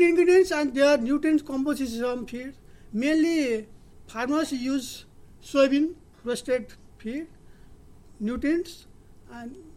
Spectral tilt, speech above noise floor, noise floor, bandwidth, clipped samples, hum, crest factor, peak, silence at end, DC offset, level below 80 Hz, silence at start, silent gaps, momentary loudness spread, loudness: -4.5 dB/octave; 24 dB; -49 dBFS; 15 kHz; under 0.1%; none; 16 dB; -8 dBFS; 0.05 s; under 0.1%; -52 dBFS; 0 s; none; 19 LU; -25 LUFS